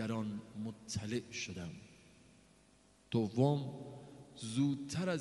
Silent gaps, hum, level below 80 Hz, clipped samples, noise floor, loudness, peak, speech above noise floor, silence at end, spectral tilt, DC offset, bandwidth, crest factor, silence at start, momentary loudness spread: none; none; -70 dBFS; under 0.1%; -67 dBFS; -38 LUFS; -18 dBFS; 30 dB; 0 s; -6 dB/octave; under 0.1%; 11.5 kHz; 22 dB; 0 s; 19 LU